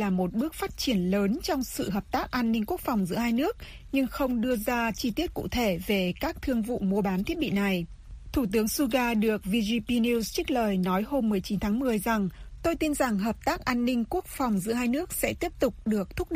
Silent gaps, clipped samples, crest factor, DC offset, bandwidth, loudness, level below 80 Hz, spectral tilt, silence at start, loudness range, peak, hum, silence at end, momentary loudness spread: none; under 0.1%; 18 dB; under 0.1%; 15.5 kHz; -28 LUFS; -44 dBFS; -5 dB/octave; 0 s; 2 LU; -10 dBFS; none; 0 s; 5 LU